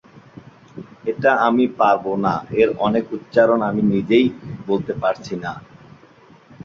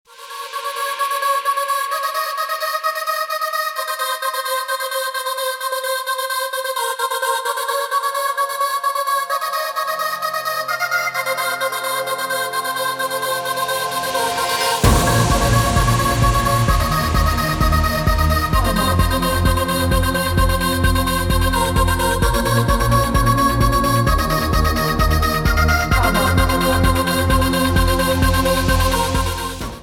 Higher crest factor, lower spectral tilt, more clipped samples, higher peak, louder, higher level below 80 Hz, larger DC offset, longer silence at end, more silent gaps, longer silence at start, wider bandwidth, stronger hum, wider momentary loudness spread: about the same, 18 dB vs 16 dB; first, -7.5 dB/octave vs -4.5 dB/octave; neither; about the same, -2 dBFS vs 0 dBFS; about the same, -19 LUFS vs -18 LUFS; second, -54 dBFS vs -24 dBFS; neither; first, 1 s vs 0 s; neither; about the same, 0.15 s vs 0.2 s; second, 7.2 kHz vs 18.5 kHz; neither; first, 13 LU vs 6 LU